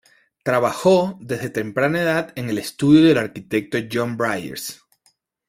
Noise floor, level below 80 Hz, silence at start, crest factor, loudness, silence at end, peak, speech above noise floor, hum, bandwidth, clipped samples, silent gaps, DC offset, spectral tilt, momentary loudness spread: -64 dBFS; -56 dBFS; 0.45 s; 18 dB; -20 LUFS; 0.75 s; -2 dBFS; 44 dB; none; 16 kHz; under 0.1%; none; under 0.1%; -6 dB/octave; 13 LU